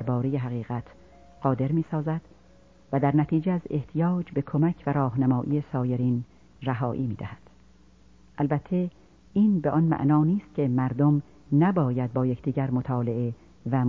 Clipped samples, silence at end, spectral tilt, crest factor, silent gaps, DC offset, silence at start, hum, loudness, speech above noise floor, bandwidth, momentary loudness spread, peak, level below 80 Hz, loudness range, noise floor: under 0.1%; 0 s; -11 dB/octave; 18 dB; none; 0.1%; 0 s; none; -26 LUFS; 31 dB; 4.3 kHz; 9 LU; -8 dBFS; -56 dBFS; 6 LU; -56 dBFS